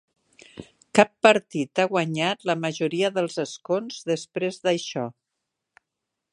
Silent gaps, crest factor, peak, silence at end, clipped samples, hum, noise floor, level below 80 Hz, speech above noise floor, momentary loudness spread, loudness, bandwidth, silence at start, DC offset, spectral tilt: none; 24 dB; 0 dBFS; 1.2 s; under 0.1%; none; -83 dBFS; -72 dBFS; 60 dB; 12 LU; -24 LUFS; 11.5 kHz; 0.55 s; under 0.1%; -4.5 dB/octave